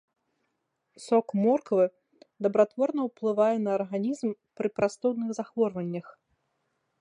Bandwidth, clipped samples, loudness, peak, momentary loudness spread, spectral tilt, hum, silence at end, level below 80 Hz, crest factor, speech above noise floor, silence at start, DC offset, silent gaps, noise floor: 10.5 kHz; under 0.1%; -28 LUFS; -8 dBFS; 9 LU; -7 dB/octave; none; 0.9 s; -74 dBFS; 20 dB; 52 dB; 1 s; under 0.1%; none; -79 dBFS